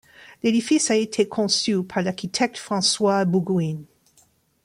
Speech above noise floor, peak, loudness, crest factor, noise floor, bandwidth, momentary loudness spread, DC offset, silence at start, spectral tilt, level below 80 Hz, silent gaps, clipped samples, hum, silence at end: 39 dB; -8 dBFS; -22 LUFS; 16 dB; -61 dBFS; 14.5 kHz; 6 LU; under 0.1%; 0.2 s; -4 dB/octave; -64 dBFS; none; under 0.1%; none; 0.8 s